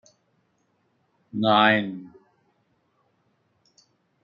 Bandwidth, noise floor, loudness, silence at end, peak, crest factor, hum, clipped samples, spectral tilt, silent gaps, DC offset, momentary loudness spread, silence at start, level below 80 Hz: 7 kHz; -70 dBFS; -21 LUFS; 2.15 s; -4 dBFS; 24 dB; none; under 0.1%; -6.5 dB/octave; none; under 0.1%; 19 LU; 1.35 s; -74 dBFS